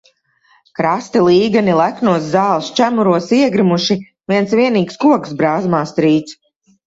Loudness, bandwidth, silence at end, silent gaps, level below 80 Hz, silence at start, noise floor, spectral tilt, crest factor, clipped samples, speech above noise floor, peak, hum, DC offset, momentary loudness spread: -14 LUFS; 8 kHz; 0.55 s; none; -56 dBFS; 0.8 s; -55 dBFS; -6 dB/octave; 14 dB; under 0.1%; 42 dB; 0 dBFS; none; under 0.1%; 6 LU